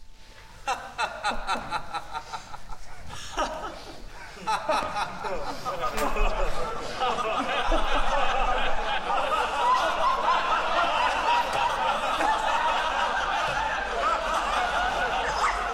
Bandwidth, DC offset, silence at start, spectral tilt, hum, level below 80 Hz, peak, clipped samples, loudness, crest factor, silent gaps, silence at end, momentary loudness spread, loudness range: 16 kHz; under 0.1%; 0 s; -2.5 dB/octave; none; -36 dBFS; -10 dBFS; under 0.1%; -26 LUFS; 16 dB; none; 0 s; 13 LU; 8 LU